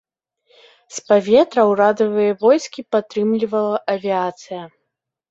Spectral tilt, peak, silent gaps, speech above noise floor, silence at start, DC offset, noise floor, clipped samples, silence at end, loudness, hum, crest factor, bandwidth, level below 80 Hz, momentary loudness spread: -5 dB/octave; -2 dBFS; none; 60 dB; 0.9 s; under 0.1%; -77 dBFS; under 0.1%; 0.65 s; -17 LUFS; none; 16 dB; 8 kHz; -64 dBFS; 18 LU